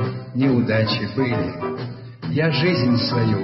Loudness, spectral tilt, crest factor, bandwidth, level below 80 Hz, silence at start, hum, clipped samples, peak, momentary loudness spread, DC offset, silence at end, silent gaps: -21 LUFS; -10 dB/octave; 14 dB; 5.8 kHz; -52 dBFS; 0 s; none; under 0.1%; -6 dBFS; 10 LU; under 0.1%; 0 s; none